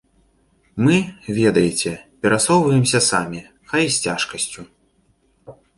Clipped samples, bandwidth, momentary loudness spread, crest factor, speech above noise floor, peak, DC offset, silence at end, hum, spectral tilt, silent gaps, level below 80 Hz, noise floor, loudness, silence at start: under 0.1%; 11.5 kHz; 11 LU; 18 dB; 43 dB; -2 dBFS; under 0.1%; 0.25 s; none; -4 dB/octave; none; -52 dBFS; -61 dBFS; -18 LUFS; 0.75 s